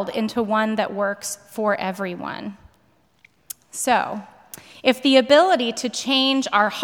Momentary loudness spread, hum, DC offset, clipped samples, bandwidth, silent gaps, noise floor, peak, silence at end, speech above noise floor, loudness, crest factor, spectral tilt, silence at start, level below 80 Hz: 20 LU; none; under 0.1%; under 0.1%; over 20 kHz; none; -61 dBFS; -2 dBFS; 0 s; 40 dB; -20 LUFS; 18 dB; -3 dB/octave; 0 s; -66 dBFS